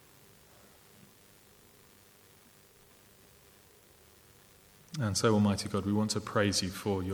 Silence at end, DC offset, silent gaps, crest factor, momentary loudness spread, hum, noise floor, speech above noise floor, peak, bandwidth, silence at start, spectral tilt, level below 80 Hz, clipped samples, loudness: 0 s; under 0.1%; none; 22 dB; 7 LU; none; -60 dBFS; 30 dB; -14 dBFS; over 20 kHz; 4.9 s; -5 dB/octave; -66 dBFS; under 0.1%; -31 LUFS